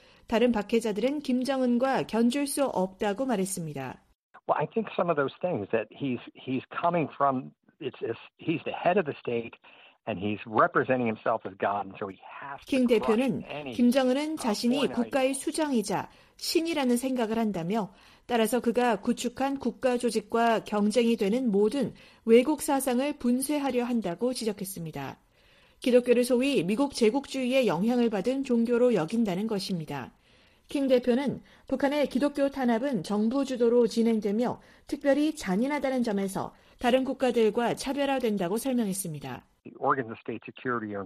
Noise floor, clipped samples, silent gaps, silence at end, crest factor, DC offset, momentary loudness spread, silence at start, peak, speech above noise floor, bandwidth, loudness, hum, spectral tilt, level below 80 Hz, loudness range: -61 dBFS; under 0.1%; 4.15-4.31 s; 0 s; 20 dB; under 0.1%; 12 LU; 0.3 s; -8 dBFS; 34 dB; 15 kHz; -28 LUFS; none; -5 dB/octave; -62 dBFS; 4 LU